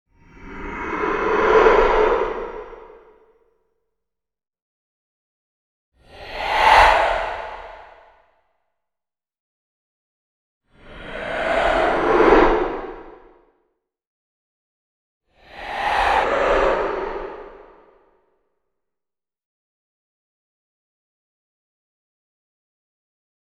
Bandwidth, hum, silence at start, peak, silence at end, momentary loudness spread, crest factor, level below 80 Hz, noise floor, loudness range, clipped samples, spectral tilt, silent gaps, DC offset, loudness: 13 kHz; none; 0.4 s; 0 dBFS; 5.9 s; 23 LU; 22 dB; -38 dBFS; -89 dBFS; 14 LU; under 0.1%; -4.5 dB/octave; 4.62-5.92 s, 9.40-10.61 s, 14.07-15.21 s; under 0.1%; -18 LUFS